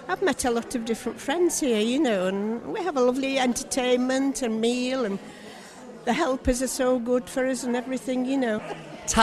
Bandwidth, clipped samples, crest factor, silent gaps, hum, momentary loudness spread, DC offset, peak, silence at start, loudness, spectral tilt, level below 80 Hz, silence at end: 13 kHz; under 0.1%; 20 dB; none; none; 9 LU; under 0.1%; -6 dBFS; 0 s; -25 LUFS; -3.5 dB/octave; -46 dBFS; 0 s